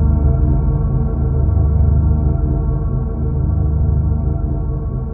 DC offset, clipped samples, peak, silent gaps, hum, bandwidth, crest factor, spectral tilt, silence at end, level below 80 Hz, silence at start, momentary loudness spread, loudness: under 0.1%; under 0.1%; -2 dBFS; none; none; 1.7 kHz; 12 dB; -15.5 dB/octave; 0 s; -18 dBFS; 0 s; 6 LU; -17 LUFS